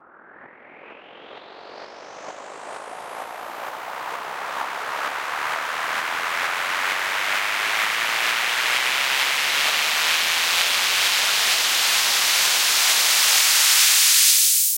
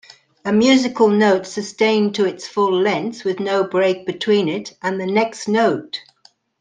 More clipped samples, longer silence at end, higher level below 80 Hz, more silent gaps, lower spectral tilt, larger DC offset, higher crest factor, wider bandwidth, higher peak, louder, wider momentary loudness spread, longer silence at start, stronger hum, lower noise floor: neither; second, 0 s vs 0.6 s; about the same, -68 dBFS vs -64 dBFS; neither; second, 3 dB/octave vs -5 dB/octave; neither; about the same, 20 dB vs 16 dB; first, 16.5 kHz vs 9.6 kHz; about the same, -2 dBFS vs -2 dBFS; about the same, -17 LUFS vs -18 LUFS; first, 20 LU vs 10 LU; about the same, 0.4 s vs 0.45 s; neither; second, -47 dBFS vs -55 dBFS